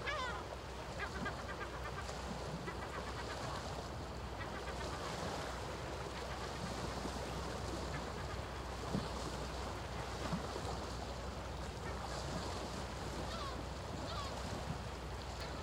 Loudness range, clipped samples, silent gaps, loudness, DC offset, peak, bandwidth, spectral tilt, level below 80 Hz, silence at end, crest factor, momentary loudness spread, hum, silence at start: 1 LU; under 0.1%; none; -44 LUFS; under 0.1%; -26 dBFS; 16 kHz; -4.5 dB/octave; -50 dBFS; 0 s; 18 dB; 3 LU; none; 0 s